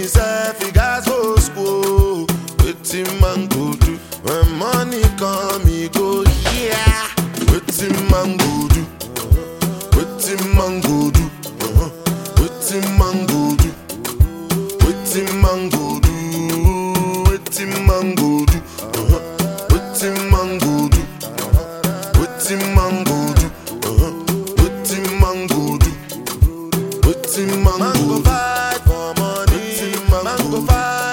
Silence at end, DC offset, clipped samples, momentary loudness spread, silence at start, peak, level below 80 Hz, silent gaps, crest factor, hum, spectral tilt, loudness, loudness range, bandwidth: 0 s; under 0.1%; under 0.1%; 6 LU; 0 s; 0 dBFS; -20 dBFS; none; 16 dB; none; -5 dB/octave; -17 LUFS; 1 LU; 17 kHz